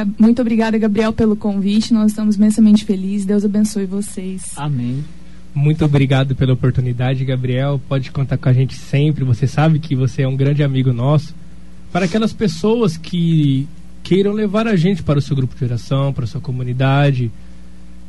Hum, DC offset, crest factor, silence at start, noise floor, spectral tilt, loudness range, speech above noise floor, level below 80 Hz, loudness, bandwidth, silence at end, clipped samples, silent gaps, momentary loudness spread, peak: none; 3%; 14 dB; 0 s; -39 dBFS; -7.5 dB/octave; 3 LU; 24 dB; -40 dBFS; -16 LUFS; 11.5 kHz; 0 s; under 0.1%; none; 9 LU; -2 dBFS